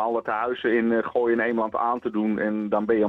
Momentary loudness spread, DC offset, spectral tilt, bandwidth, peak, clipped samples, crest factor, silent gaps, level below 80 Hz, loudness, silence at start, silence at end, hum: 3 LU; under 0.1%; -8.5 dB/octave; 4.5 kHz; -10 dBFS; under 0.1%; 14 dB; none; -64 dBFS; -24 LUFS; 0 s; 0 s; none